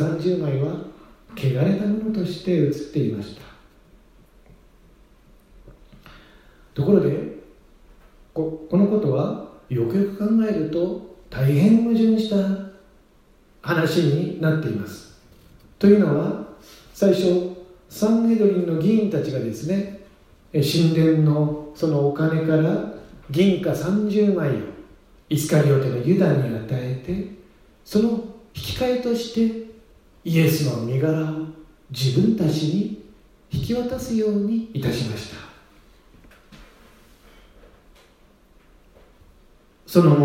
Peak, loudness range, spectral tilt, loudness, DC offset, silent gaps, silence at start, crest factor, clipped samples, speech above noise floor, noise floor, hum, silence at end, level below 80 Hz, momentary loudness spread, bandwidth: 0 dBFS; 6 LU; -7.5 dB/octave; -21 LUFS; under 0.1%; none; 0 s; 22 dB; under 0.1%; 35 dB; -54 dBFS; none; 0 s; -52 dBFS; 17 LU; 16 kHz